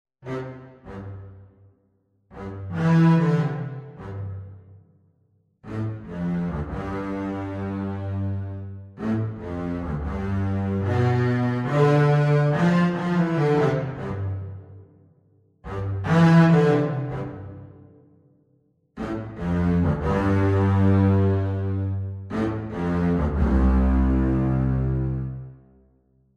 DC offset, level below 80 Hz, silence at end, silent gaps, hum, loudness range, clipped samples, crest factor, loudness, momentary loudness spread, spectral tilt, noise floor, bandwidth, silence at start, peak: under 0.1%; -34 dBFS; 0.8 s; none; none; 8 LU; under 0.1%; 18 dB; -23 LUFS; 19 LU; -9 dB/octave; -66 dBFS; 7.6 kHz; 0.25 s; -6 dBFS